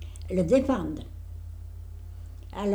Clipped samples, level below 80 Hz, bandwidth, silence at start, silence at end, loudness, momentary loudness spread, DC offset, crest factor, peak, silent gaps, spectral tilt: under 0.1%; -42 dBFS; over 20 kHz; 0 s; 0 s; -27 LUFS; 20 LU; under 0.1%; 18 dB; -10 dBFS; none; -7.5 dB/octave